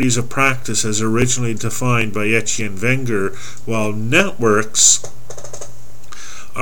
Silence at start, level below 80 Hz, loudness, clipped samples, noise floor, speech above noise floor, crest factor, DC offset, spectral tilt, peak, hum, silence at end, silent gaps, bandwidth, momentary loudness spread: 0 s; -46 dBFS; -16 LUFS; under 0.1%; -40 dBFS; 23 dB; 20 dB; 10%; -3 dB/octave; 0 dBFS; none; 0 s; none; 18.5 kHz; 23 LU